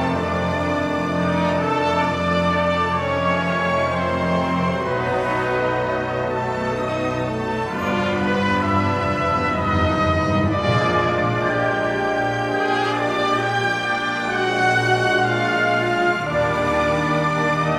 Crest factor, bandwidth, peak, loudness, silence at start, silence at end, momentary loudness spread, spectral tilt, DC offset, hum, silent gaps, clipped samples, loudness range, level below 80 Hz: 14 dB; 13.5 kHz; -6 dBFS; -20 LUFS; 0 s; 0 s; 4 LU; -6 dB/octave; under 0.1%; none; none; under 0.1%; 3 LU; -44 dBFS